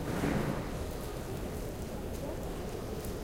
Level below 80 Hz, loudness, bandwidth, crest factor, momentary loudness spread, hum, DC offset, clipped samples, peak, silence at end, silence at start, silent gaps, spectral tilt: -44 dBFS; -38 LUFS; 17 kHz; 16 dB; 7 LU; none; under 0.1%; under 0.1%; -20 dBFS; 0 s; 0 s; none; -6 dB/octave